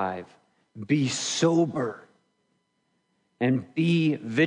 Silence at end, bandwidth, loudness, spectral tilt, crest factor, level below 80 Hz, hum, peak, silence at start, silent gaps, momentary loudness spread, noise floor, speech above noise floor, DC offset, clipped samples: 0 s; 10.5 kHz; -25 LUFS; -5 dB/octave; 18 dB; -74 dBFS; none; -10 dBFS; 0 s; none; 13 LU; -73 dBFS; 49 dB; under 0.1%; under 0.1%